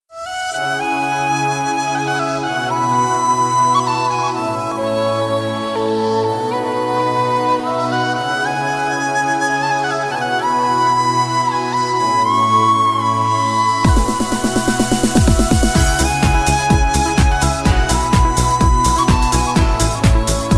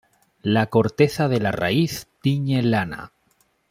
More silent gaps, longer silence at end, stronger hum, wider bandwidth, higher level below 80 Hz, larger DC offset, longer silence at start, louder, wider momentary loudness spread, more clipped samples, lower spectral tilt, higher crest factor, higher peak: neither; second, 0 s vs 0.65 s; neither; second, 13.5 kHz vs 16 kHz; first, -24 dBFS vs -54 dBFS; neither; second, 0.1 s vs 0.45 s; first, -16 LUFS vs -21 LUFS; second, 5 LU vs 8 LU; neither; second, -4.5 dB/octave vs -6.5 dB/octave; about the same, 14 dB vs 18 dB; about the same, -2 dBFS vs -4 dBFS